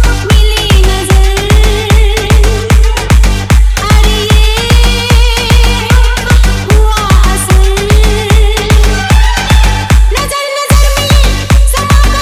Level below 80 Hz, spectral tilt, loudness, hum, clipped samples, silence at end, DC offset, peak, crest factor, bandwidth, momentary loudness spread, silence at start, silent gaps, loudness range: -8 dBFS; -4.5 dB/octave; -8 LUFS; none; 6%; 0 s; under 0.1%; 0 dBFS; 6 dB; 15.5 kHz; 1 LU; 0 s; none; 1 LU